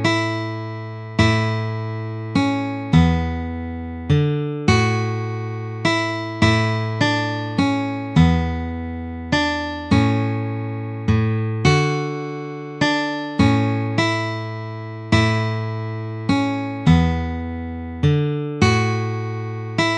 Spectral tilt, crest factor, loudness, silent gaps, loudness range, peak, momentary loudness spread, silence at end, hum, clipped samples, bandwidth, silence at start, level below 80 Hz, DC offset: -6 dB/octave; 18 dB; -21 LUFS; none; 1 LU; -2 dBFS; 11 LU; 0 s; none; under 0.1%; 9.4 kHz; 0 s; -36 dBFS; under 0.1%